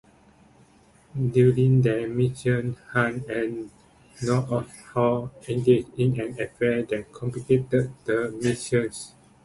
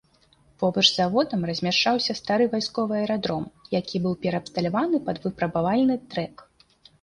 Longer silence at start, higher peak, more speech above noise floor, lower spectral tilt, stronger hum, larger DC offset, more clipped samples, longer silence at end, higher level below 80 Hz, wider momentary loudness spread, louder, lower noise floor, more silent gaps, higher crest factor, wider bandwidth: first, 1.15 s vs 0.6 s; about the same, -6 dBFS vs -6 dBFS; second, 32 dB vs 36 dB; first, -7 dB/octave vs -5 dB/octave; neither; neither; neither; second, 0.35 s vs 0.6 s; first, -54 dBFS vs -60 dBFS; first, 13 LU vs 10 LU; about the same, -25 LUFS vs -24 LUFS; second, -56 dBFS vs -60 dBFS; neither; about the same, 18 dB vs 20 dB; about the same, 11.5 kHz vs 11 kHz